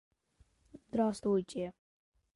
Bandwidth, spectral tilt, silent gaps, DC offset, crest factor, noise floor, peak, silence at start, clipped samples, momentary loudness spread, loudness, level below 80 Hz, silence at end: 11.5 kHz; -7 dB/octave; none; under 0.1%; 18 dB; -70 dBFS; -20 dBFS; 0.75 s; under 0.1%; 10 LU; -35 LUFS; -68 dBFS; 0.65 s